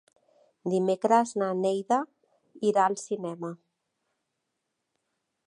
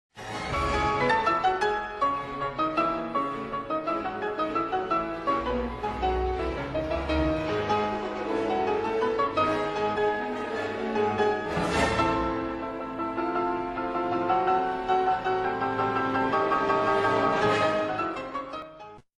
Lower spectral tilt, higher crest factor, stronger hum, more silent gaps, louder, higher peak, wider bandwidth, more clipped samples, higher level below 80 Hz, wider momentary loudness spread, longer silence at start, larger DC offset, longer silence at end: about the same, -5.5 dB/octave vs -5.5 dB/octave; about the same, 20 dB vs 16 dB; neither; neither; about the same, -27 LUFS vs -27 LUFS; first, -8 dBFS vs -12 dBFS; about the same, 11 kHz vs 12 kHz; neither; second, -86 dBFS vs -44 dBFS; first, 14 LU vs 7 LU; first, 0.65 s vs 0.15 s; neither; first, 1.95 s vs 0.2 s